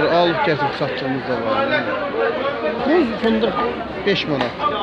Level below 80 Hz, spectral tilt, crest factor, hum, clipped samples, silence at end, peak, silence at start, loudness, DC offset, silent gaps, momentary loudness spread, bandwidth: -48 dBFS; -6.5 dB/octave; 16 dB; none; under 0.1%; 0 s; -4 dBFS; 0 s; -19 LUFS; under 0.1%; none; 5 LU; 8.2 kHz